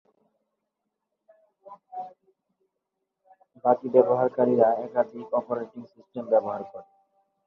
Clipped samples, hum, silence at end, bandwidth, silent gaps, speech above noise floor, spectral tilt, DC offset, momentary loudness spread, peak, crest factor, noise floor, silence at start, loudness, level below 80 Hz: under 0.1%; none; 0.65 s; 4.1 kHz; none; 58 dB; -10 dB/octave; under 0.1%; 21 LU; -4 dBFS; 24 dB; -82 dBFS; 1.65 s; -24 LUFS; -76 dBFS